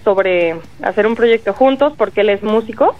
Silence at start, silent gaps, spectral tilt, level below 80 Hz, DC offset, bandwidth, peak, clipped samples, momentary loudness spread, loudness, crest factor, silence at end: 0.05 s; none; -6.5 dB/octave; -50 dBFS; 1%; 7.4 kHz; -2 dBFS; under 0.1%; 6 LU; -14 LUFS; 12 dB; 0.05 s